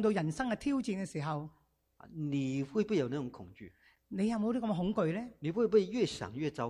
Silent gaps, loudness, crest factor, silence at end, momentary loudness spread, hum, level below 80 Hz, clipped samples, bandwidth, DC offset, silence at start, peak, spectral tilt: none; -34 LUFS; 18 dB; 0 s; 15 LU; none; -64 dBFS; under 0.1%; 11.5 kHz; under 0.1%; 0 s; -16 dBFS; -6.5 dB/octave